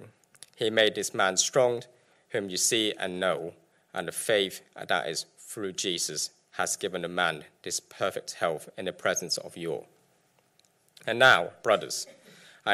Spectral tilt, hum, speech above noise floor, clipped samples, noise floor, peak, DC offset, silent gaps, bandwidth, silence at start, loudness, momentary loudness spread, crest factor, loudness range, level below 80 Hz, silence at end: -2 dB/octave; none; 39 dB; under 0.1%; -67 dBFS; -8 dBFS; under 0.1%; none; 16 kHz; 0 s; -28 LUFS; 13 LU; 22 dB; 5 LU; -76 dBFS; 0 s